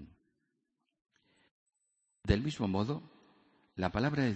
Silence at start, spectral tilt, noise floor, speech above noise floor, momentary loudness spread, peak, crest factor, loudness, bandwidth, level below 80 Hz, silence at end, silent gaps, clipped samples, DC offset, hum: 0 s; -7 dB/octave; -84 dBFS; 52 dB; 12 LU; -14 dBFS; 22 dB; -34 LUFS; 8.2 kHz; -50 dBFS; 0 s; 1.51-1.66 s; under 0.1%; under 0.1%; none